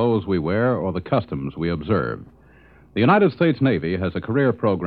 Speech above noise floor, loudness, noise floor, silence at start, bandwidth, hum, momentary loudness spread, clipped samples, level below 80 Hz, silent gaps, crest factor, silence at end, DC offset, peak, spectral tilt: 30 dB; -21 LUFS; -50 dBFS; 0 s; 5.2 kHz; none; 10 LU; under 0.1%; -48 dBFS; none; 18 dB; 0 s; under 0.1%; -4 dBFS; -10.5 dB/octave